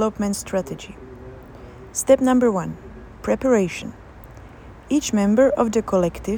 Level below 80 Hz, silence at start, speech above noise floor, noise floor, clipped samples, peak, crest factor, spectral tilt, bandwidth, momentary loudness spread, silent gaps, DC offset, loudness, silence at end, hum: -44 dBFS; 0 s; 22 dB; -41 dBFS; under 0.1%; -4 dBFS; 18 dB; -5.5 dB/octave; over 20 kHz; 23 LU; none; under 0.1%; -20 LUFS; 0 s; none